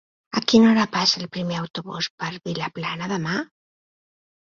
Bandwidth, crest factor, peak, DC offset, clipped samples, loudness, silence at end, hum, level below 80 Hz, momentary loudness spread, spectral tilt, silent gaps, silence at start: 7.4 kHz; 20 dB; -2 dBFS; under 0.1%; under 0.1%; -22 LUFS; 0.95 s; none; -60 dBFS; 13 LU; -4.5 dB/octave; 1.70-1.74 s, 2.10-2.18 s; 0.35 s